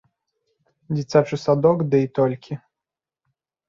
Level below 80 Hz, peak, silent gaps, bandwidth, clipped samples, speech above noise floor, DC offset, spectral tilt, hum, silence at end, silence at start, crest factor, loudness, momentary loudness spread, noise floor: -62 dBFS; -2 dBFS; none; 7.6 kHz; under 0.1%; 68 dB; under 0.1%; -8 dB/octave; none; 1.1 s; 0.9 s; 20 dB; -20 LUFS; 15 LU; -88 dBFS